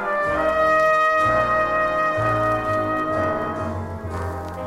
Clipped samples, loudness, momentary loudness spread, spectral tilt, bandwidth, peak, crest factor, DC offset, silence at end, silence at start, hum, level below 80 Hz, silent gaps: under 0.1%; -20 LUFS; 12 LU; -6.5 dB/octave; 15.5 kHz; -8 dBFS; 14 dB; under 0.1%; 0 s; 0 s; none; -42 dBFS; none